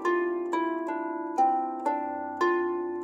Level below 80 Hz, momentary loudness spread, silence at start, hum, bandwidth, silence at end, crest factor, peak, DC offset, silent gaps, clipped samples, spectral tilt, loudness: -78 dBFS; 6 LU; 0 s; none; 8.6 kHz; 0 s; 14 dB; -14 dBFS; under 0.1%; none; under 0.1%; -4.5 dB/octave; -29 LUFS